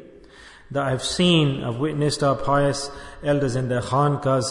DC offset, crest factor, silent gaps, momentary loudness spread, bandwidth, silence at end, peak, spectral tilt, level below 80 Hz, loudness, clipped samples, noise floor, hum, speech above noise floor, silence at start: under 0.1%; 16 dB; none; 9 LU; 11 kHz; 0 s; -6 dBFS; -5.5 dB/octave; -46 dBFS; -22 LUFS; under 0.1%; -46 dBFS; none; 25 dB; 0 s